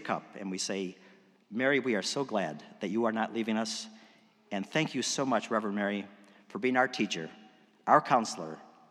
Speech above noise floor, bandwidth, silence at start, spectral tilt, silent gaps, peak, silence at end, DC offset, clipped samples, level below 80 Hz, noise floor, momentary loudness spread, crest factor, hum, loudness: 30 dB; 13.5 kHz; 0 s; -4 dB/octave; none; -8 dBFS; 0.25 s; under 0.1%; under 0.1%; under -90 dBFS; -61 dBFS; 14 LU; 24 dB; none; -31 LUFS